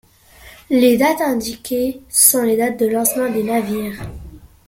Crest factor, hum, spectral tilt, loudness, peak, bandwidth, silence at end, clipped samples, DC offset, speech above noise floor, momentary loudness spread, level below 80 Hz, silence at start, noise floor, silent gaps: 18 dB; none; -3 dB/octave; -16 LUFS; 0 dBFS; 17 kHz; 0.3 s; under 0.1%; under 0.1%; 28 dB; 13 LU; -46 dBFS; 0.45 s; -44 dBFS; none